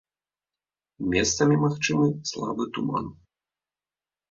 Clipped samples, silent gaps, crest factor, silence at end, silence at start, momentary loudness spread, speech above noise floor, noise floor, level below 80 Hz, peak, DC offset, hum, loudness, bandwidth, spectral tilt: under 0.1%; none; 20 dB; 1.2 s; 1 s; 10 LU; over 65 dB; under -90 dBFS; -52 dBFS; -8 dBFS; under 0.1%; 50 Hz at -40 dBFS; -25 LUFS; 7.8 kHz; -4.5 dB/octave